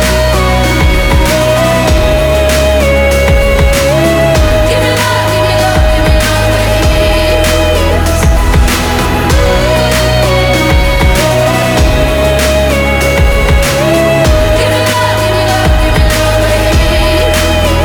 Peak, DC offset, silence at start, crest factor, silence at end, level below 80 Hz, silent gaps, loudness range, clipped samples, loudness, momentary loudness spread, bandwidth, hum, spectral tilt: 0 dBFS; under 0.1%; 0 s; 8 dB; 0 s; -12 dBFS; none; 1 LU; under 0.1%; -9 LUFS; 1 LU; 20 kHz; none; -5 dB/octave